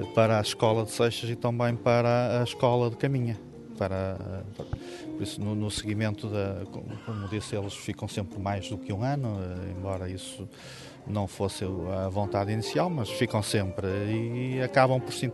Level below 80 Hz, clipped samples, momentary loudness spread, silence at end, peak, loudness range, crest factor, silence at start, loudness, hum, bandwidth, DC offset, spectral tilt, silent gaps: -56 dBFS; under 0.1%; 14 LU; 0 s; -8 dBFS; 7 LU; 22 dB; 0 s; -29 LUFS; none; 12 kHz; under 0.1%; -6 dB/octave; none